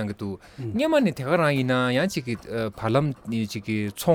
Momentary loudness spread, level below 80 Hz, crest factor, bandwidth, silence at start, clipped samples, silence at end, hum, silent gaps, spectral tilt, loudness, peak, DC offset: 9 LU; -56 dBFS; 16 dB; over 20 kHz; 0 s; under 0.1%; 0 s; none; none; -6 dB/octave; -25 LUFS; -8 dBFS; under 0.1%